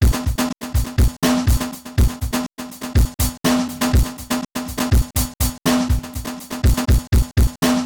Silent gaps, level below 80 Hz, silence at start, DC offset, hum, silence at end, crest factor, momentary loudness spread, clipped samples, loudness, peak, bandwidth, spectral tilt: none; -22 dBFS; 0 s; 0.4%; none; 0 s; 12 dB; 7 LU; under 0.1%; -20 LUFS; -6 dBFS; 19.5 kHz; -5 dB/octave